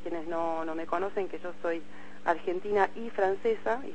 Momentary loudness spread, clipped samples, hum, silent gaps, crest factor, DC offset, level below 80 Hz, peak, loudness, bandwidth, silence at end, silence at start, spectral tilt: 7 LU; under 0.1%; none; none; 20 dB; 2%; -64 dBFS; -12 dBFS; -32 LUFS; 8.6 kHz; 0 s; 0 s; -6 dB/octave